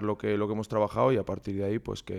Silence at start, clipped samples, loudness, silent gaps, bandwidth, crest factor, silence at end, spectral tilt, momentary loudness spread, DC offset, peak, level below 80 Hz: 0 s; under 0.1%; -29 LUFS; none; 12.5 kHz; 16 dB; 0 s; -7.5 dB/octave; 7 LU; under 0.1%; -12 dBFS; -56 dBFS